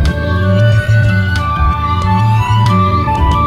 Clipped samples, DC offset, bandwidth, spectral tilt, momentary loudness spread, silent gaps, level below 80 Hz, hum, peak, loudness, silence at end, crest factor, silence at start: under 0.1%; under 0.1%; 10.5 kHz; -7 dB/octave; 4 LU; none; -20 dBFS; none; -2 dBFS; -12 LUFS; 0 s; 10 dB; 0 s